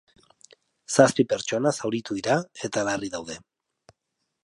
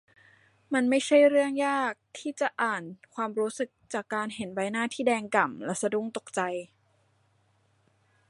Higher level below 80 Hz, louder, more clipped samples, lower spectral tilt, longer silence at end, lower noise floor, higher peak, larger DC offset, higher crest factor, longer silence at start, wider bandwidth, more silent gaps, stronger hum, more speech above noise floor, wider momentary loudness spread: first, -64 dBFS vs -78 dBFS; first, -25 LUFS vs -28 LUFS; neither; about the same, -4.5 dB/octave vs -4 dB/octave; second, 1.05 s vs 1.65 s; first, -79 dBFS vs -68 dBFS; first, -4 dBFS vs -8 dBFS; neither; about the same, 22 dB vs 22 dB; first, 0.9 s vs 0.7 s; about the same, 11.5 kHz vs 11.5 kHz; neither; neither; first, 55 dB vs 40 dB; about the same, 14 LU vs 13 LU